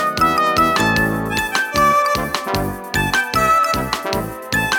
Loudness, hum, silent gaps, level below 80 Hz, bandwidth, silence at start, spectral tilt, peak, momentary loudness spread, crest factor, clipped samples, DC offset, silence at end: -17 LUFS; none; none; -36 dBFS; 19.5 kHz; 0 s; -3.5 dB/octave; -2 dBFS; 7 LU; 16 dB; under 0.1%; under 0.1%; 0 s